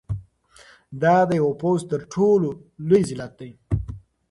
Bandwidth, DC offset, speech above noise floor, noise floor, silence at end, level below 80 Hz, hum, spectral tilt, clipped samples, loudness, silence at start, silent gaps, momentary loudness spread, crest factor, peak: 11.5 kHz; under 0.1%; 31 dB; -52 dBFS; 0.3 s; -42 dBFS; none; -7.5 dB/octave; under 0.1%; -21 LUFS; 0.1 s; none; 19 LU; 18 dB; -6 dBFS